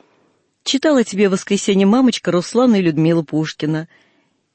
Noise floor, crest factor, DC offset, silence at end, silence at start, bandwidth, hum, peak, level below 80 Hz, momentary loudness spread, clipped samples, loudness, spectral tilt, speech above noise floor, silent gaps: -61 dBFS; 12 dB; under 0.1%; 0.7 s; 0.65 s; 8.8 kHz; none; -4 dBFS; -62 dBFS; 8 LU; under 0.1%; -16 LUFS; -5.5 dB/octave; 45 dB; none